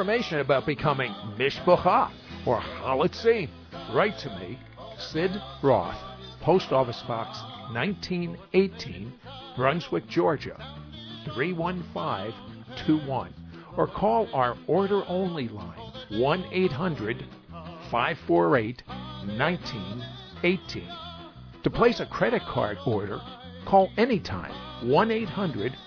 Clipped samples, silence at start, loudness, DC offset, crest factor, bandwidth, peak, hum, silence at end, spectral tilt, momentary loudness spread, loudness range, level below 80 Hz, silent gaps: under 0.1%; 0 s; -27 LUFS; under 0.1%; 22 dB; 5.4 kHz; -6 dBFS; none; 0 s; -7 dB/octave; 17 LU; 4 LU; -52 dBFS; none